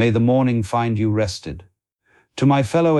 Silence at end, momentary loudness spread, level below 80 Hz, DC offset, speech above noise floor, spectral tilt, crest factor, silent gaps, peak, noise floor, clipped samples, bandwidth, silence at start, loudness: 0 s; 18 LU; -48 dBFS; under 0.1%; 43 dB; -7 dB/octave; 12 dB; none; -6 dBFS; -61 dBFS; under 0.1%; 12 kHz; 0 s; -19 LUFS